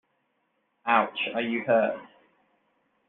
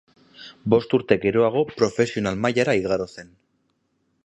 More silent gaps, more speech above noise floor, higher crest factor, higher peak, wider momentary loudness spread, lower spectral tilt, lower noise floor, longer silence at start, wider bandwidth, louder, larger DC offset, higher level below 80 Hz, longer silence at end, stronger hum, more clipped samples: neither; about the same, 49 dB vs 49 dB; about the same, 22 dB vs 20 dB; second, -6 dBFS vs -2 dBFS; about the same, 10 LU vs 8 LU; second, -2 dB/octave vs -6 dB/octave; first, -74 dBFS vs -70 dBFS; first, 0.85 s vs 0.4 s; second, 4.1 kHz vs 8.6 kHz; second, -26 LUFS vs -21 LUFS; neither; second, -78 dBFS vs -54 dBFS; about the same, 1 s vs 1 s; neither; neither